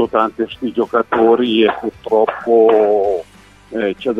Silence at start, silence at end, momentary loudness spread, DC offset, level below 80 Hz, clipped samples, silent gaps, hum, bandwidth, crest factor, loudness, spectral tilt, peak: 0 s; 0 s; 10 LU; under 0.1%; -52 dBFS; under 0.1%; none; none; 6 kHz; 14 dB; -15 LUFS; -6.5 dB/octave; 0 dBFS